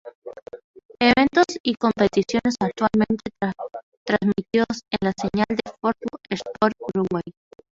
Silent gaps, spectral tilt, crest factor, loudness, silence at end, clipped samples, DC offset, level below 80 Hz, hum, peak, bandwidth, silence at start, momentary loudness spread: 0.15-0.22 s, 0.42-0.46 s, 0.64-0.74 s, 0.85-0.89 s, 1.60-1.64 s, 3.83-4.06 s; -5.5 dB/octave; 20 dB; -22 LUFS; 0.4 s; under 0.1%; under 0.1%; -52 dBFS; none; -2 dBFS; 7.8 kHz; 0.05 s; 17 LU